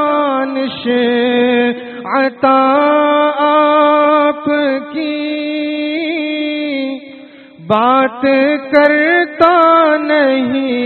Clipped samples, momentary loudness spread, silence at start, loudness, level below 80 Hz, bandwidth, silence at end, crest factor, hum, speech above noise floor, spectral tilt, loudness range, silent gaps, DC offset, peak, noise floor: under 0.1%; 9 LU; 0 s; -12 LUFS; -58 dBFS; 4.5 kHz; 0 s; 12 dB; none; 25 dB; -2 dB/octave; 6 LU; none; under 0.1%; 0 dBFS; -36 dBFS